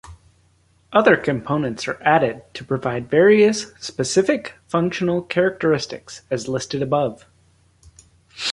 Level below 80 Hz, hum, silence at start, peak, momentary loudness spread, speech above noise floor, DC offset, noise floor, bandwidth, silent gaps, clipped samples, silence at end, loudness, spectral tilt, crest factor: -54 dBFS; none; 0.1 s; -2 dBFS; 11 LU; 39 dB; under 0.1%; -59 dBFS; 11.5 kHz; none; under 0.1%; 0 s; -20 LUFS; -5 dB/octave; 20 dB